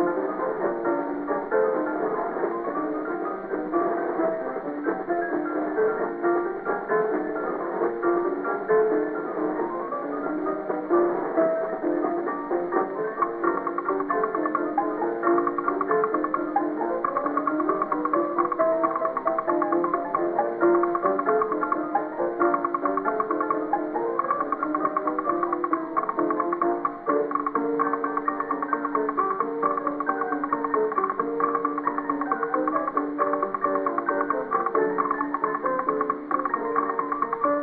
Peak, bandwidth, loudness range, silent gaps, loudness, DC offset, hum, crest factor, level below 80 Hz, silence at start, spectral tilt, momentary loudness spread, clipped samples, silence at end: -10 dBFS; 4.2 kHz; 2 LU; none; -25 LUFS; under 0.1%; none; 16 dB; -64 dBFS; 0 s; -6.5 dB/octave; 5 LU; under 0.1%; 0 s